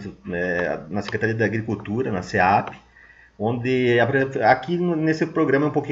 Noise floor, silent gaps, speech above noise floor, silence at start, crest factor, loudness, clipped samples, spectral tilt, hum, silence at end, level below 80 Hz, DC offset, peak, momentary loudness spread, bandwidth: -51 dBFS; none; 29 dB; 0 s; 20 dB; -22 LUFS; under 0.1%; -7 dB/octave; none; 0 s; -54 dBFS; under 0.1%; -2 dBFS; 8 LU; 7.8 kHz